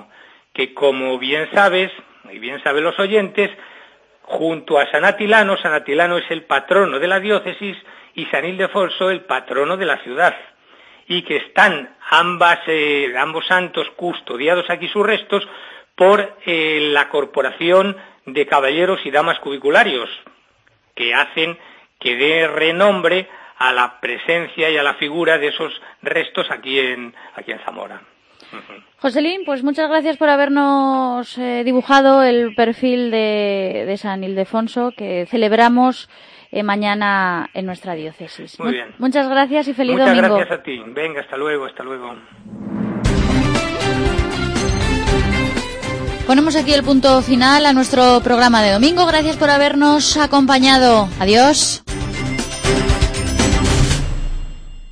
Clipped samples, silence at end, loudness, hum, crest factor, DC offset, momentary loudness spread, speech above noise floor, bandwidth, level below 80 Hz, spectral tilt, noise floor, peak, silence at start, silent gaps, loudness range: under 0.1%; 0 s; -16 LUFS; none; 16 dB; under 0.1%; 14 LU; 41 dB; 10.5 kHz; -32 dBFS; -4 dB/octave; -57 dBFS; 0 dBFS; 0.55 s; none; 7 LU